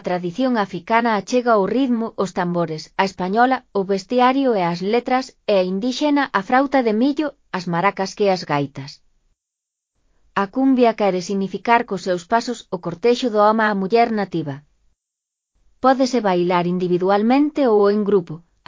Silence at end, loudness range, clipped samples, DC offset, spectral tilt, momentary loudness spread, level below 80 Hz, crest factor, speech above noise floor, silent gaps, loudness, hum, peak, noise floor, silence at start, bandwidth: 0.3 s; 3 LU; under 0.1%; under 0.1%; -6 dB/octave; 8 LU; -60 dBFS; 18 dB; 63 dB; none; -19 LUFS; none; 0 dBFS; -82 dBFS; 0.05 s; 7.6 kHz